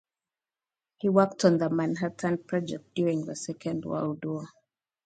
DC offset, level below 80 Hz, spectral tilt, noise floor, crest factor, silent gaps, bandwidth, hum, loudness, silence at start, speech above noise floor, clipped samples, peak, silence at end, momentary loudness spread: under 0.1%; -70 dBFS; -6.5 dB/octave; under -90 dBFS; 22 dB; none; 9.2 kHz; none; -28 LUFS; 1.05 s; over 62 dB; under 0.1%; -8 dBFS; 0.6 s; 11 LU